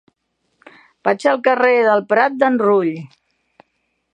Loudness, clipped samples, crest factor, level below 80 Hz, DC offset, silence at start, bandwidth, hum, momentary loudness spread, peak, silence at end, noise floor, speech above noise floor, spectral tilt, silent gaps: -16 LUFS; under 0.1%; 18 dB; -72 dBFS; under 0.1%; 1.05 s; 9.8 kHz; none; 9 LU; 0 dBFS; 1.05 s; -69 dBFS; 54 dB; -6 dB/octave; none